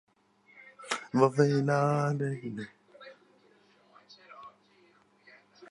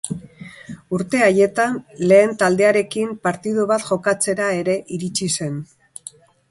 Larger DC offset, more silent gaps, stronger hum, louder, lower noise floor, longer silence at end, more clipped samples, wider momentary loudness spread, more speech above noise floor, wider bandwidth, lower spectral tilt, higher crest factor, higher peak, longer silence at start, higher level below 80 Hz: neither; neither; neither; second, -29 LUFS vs -19 LUFS; first, -64 dBFS vs -43 dBFS; second, 0.05 s vs 0.85 s; neither; first, 27 LU vs 22 LU; first, 37 dB vs 24 dB; about the same, 11.5 kHz vs 11.5 kHz; first, -6.5 dB/octave vs -4.5 dB/octave; first, 24 dB vs 18 dB; second, -10 dBFS vs -2 dBFS; first, 0.8 s vs 0.05 s; second, -78 dBFS vs -60 dBFS